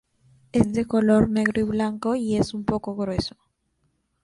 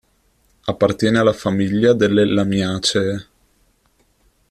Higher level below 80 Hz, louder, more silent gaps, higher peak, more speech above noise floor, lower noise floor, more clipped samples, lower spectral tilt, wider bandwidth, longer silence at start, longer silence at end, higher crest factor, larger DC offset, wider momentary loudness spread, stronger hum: about the same, -46 dBFS vs -50 dBFS; second, -23 LUFS vs -17 LUFS; neither; about the same, -4 dBFS vs -2 dBFS; first, 48 dB vs 44 dB; first, -71 dBFS vs -60 dBFS; neither; about the same, -6.5 dB/octave vs -5.5 dB/octave; second, 11.5 kHz vs 13.5 kHz; about the same, 0.55 s vs 0.65 s; second, 0.95 s vs 1.3 s; about the same, 20 dB vs 16 dB; neither; about the same, 8 LU vs 10 LU; neither